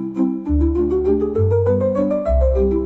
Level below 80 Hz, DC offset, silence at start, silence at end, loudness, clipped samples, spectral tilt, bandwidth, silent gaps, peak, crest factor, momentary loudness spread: -24 dBFS; under 0.1%; 0 s; 0 s; -18 LUFS; under 0.1%; -11.5 dB/octave; 4.2 kHz; none; -6 dBFS; 10 dB; 3 LU